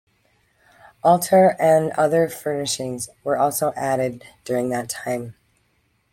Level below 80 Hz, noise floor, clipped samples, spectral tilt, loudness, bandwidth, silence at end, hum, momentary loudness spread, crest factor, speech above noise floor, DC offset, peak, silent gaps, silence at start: -62 dBFS; -66 dBFS; under 0.1%; -4.5 dB/octave; -20 LUFS; 16.5 kHz; 0.8 s; none; 13 LU; 18 dB; 46 dB; under 0.1%; -4 dBFS; none; 1.05 s